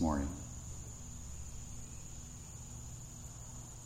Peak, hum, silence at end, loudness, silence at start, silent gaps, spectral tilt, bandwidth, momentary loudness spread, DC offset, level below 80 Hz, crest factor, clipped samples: -22 dBFS; none; 0 s; -46 LUFS; 0 s; none; -5.5 dB/octave; 16 kHz; 7 LU; under 0.1%; -50 dBFS; 22 dB; under 0.1%